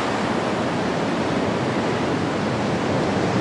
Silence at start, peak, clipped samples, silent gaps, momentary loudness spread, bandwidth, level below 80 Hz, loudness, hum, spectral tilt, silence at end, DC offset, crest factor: 0 s; -10 dBFS; under 0.1%; none; 1 LU; 11.5 kHz; -50 dBFS; -22 LUFS; none; -6 dB/octave; 0 s; under 0.1%; 12 dB